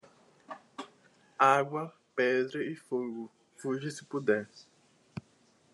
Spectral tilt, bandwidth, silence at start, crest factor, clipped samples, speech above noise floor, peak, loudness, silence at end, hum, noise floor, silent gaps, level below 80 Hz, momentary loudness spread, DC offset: -5.5 dB/octave; 12 kHz; 0.5 s; 24 dB; under 0.1%; 35 dB; -10 dBFS; -31 LUFS; 0.55 s; none; -66 dBFS; none; -82 dBFS; 23 LU; under 0.1%